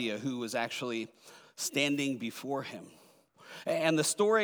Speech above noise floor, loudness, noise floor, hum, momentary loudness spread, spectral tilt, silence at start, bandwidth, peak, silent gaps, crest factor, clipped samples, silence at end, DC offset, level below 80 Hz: 26 dB; -32 LUFS; -58 dBFS; none; 17 LU; -3.5 dB/octave; 0 s; over 20 kHz; -12 dBFS; none; 20 dB; under 0.1%; 0 s; under 0.1%; -88 dBFS